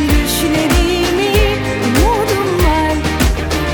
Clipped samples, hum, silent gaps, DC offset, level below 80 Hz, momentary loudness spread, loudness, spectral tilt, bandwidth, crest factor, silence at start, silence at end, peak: under 0.1%; none; none; under 0.1%; -18 dBFS; 3 LU; -14 LUFS; -5 dB/octave; 19.5 kHz; 14 dB; 0 s; 0 s; 0 dBFS